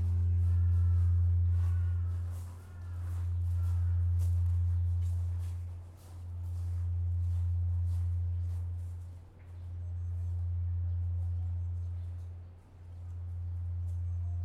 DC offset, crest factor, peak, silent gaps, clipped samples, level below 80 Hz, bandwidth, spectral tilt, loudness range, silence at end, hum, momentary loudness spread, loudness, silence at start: under 0.1%; 10 dB; -22 dBFS; none; under 0.1%; -48 dBFS; 1.9 kHz; -8.5 dB/octave; 6 LU; 0 s; none; 17 LU; -34 LUFS; 0 s